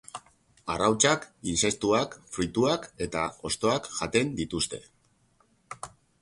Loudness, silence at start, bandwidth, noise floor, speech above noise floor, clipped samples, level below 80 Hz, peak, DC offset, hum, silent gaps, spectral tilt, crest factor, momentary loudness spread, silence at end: -27 LUFS; 0.15 s; 11.5 kHz; -66 dBFS; 39 dB; under 0.1%; -54 dBFS; -6 dBFS; under 0.1%; none; none; -3.5 dB/octave; 22 dB; 19 LU; 0.35 s